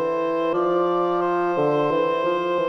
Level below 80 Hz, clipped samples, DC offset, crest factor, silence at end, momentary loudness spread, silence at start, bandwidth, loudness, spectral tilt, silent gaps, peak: -62 dBFS; under 0.1%; under 0.1%; 10 dB; 0 s; 2 LU; 0 s; 6.2 kHz; -22 LUFS; -7.5 dB/octave; none; -10 dBFS